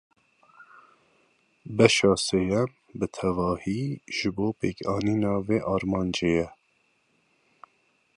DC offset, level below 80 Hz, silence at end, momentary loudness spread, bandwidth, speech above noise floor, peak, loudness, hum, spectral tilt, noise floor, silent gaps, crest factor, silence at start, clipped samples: under 0.1%; -52 dBFS; 1.65 s; 10 LU; 11.5 kHz; 44 dB; -2 dBFS; -26 LUFS; none; -5 dB/octave; -69 dBFS; none; 26 dB; 1.65 s; under 0.1%